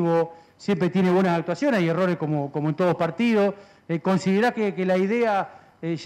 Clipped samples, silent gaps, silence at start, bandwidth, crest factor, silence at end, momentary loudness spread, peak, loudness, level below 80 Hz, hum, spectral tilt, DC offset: under 0.1%; none; 0 s; 10 kHz; 10 dB; 0 s; 10 LU; -12 dBFS; -23 LUFS; -68 dBFS; none; -7.5 dB/octave; under 0.1%